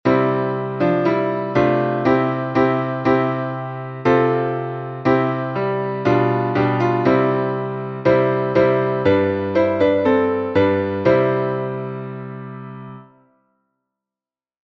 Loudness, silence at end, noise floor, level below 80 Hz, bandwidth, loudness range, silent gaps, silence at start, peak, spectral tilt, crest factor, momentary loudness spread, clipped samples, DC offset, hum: -19 LUFS; 1.7 s; under -90 dBFS; -52 dBFS; 6.6 kHz; 4 LU; none; 0.05 s; -2 dBFS; -9 dB/octave; 16 dB; 11 LU; under 0.1%; under 0.1%; none